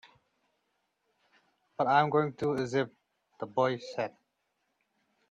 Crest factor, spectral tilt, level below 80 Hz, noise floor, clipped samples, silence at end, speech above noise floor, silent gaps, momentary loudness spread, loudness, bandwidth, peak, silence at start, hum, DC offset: 24 dB; -6.5 dB/octave; -74 dBFS; -79 dBFS; under 0.1%; 1.2 s; 50 dB; none; 13 LU; -30 LUFS; 9.4 kHz; -10 dBFS; 1.8 s; none; under 0.1%